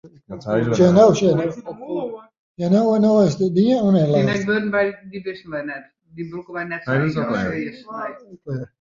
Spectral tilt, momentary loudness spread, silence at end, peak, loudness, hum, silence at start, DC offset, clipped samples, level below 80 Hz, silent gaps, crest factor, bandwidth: -7 dB/octave; 17 LU; 0.15 s; -2 dBFS; -19 LUFS; none; 0.05 s; under 0.1%; under 0.1%; -54 dBFS; 2.39-2.55 s; 18 dB; 7.6 kHz